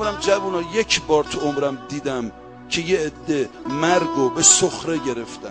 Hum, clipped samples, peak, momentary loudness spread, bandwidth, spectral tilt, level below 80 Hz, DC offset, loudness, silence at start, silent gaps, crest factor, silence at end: none; under 0.1%; 0 dBFS; 13 LU; 10 kHz; -2.5 dB/octave; -48 dBFS; under 0.1%; -20 LUFS; 0 s; none; 20 dB; 0 s